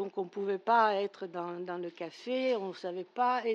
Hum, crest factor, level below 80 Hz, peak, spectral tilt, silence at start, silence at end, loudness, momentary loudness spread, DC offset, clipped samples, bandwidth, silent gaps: none; 18 dB; under -90 dBFS; -14 dBFS; -5.5 dB/octave; 0 s; 0 s; -33 LUFS; 13 LU; under 0.1%; under 0.1%; 8.2 kHz; none